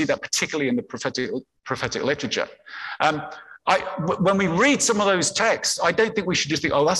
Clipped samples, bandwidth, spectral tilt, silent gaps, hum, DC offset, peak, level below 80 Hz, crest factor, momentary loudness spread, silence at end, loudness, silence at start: under 0.1%; 13 kHz; -3.5 dB/octave; none; none; under 0.1%; -6 dBFS; -56 dBFS; 18 dB; 12 LU; 0 s; -22 LUFS; 0 s